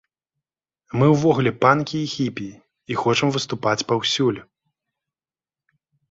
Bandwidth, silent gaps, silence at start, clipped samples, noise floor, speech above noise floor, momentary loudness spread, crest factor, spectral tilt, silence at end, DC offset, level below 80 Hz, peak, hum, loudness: 8 kHz; none; 0.95 s; under 0.1%; under -90 dBFS; over 70 dB; 12 LU; 20 dB; -5.5 dB/octave; 1.7 s; under 0.1%; -58 dBFS; -2 dBFS; none; -20 LUFS